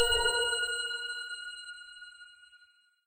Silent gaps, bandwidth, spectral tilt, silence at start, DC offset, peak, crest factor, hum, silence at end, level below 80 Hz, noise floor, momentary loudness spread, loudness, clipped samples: none; 16 kHz; 1 dB/octave; 0 s; under 0.1%; -14 dBFS; 20 dB; none; 0.5 s; -52 dBFS; -65 dBFS; 23 LU; -31 LUFS; under 0.1%